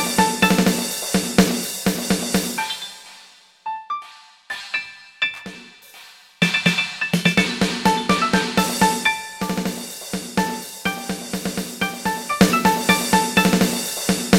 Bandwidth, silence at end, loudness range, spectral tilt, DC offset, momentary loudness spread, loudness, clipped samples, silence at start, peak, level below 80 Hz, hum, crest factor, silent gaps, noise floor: 17 kHz; 0 s; 8 LU; -3.5 dB/octave; under 0.1%; 13 LU; -20 LUFS; under 0.1%; 0 s; 0 dBFS; -48 dBFS; none; 20 dB; none; -48 dBFS